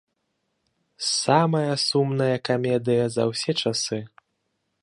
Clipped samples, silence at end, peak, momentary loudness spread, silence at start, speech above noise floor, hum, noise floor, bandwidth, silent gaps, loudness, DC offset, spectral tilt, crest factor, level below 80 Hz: under 0.1%; 0.75 s; -4 dBFS; 6 LU; 1 s; 53 dB; none; -75 dBFS; 11.5 kHz; none; -23 LUFS; under 0.1%; -4.5 dB/octave; 22 dB; -68 dBFS